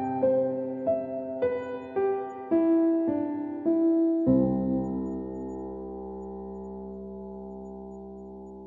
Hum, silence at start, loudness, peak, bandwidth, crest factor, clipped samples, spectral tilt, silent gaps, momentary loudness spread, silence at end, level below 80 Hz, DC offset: none; 0 s; -28 LUFS; -12 dBFS; 3.7 kHz; 16 dB; under 0.1%; -11 dB/octave; none; 17 LU; 0 s; -54 dBFS; under 0.1%